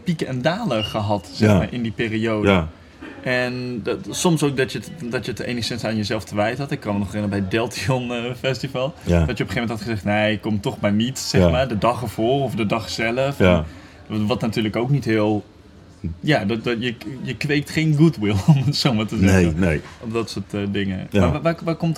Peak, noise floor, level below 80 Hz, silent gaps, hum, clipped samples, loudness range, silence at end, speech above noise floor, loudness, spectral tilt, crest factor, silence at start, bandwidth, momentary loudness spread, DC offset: 0 dBFS; -45 dBFS; -42 dBFS; none; none; under 0.1%; 4 LU; 0 s; 25 dB; -21 LUFS; -6 dB/octave; 20 dB; 0 s; 15.5 kHz; 9 LU; under 0.1%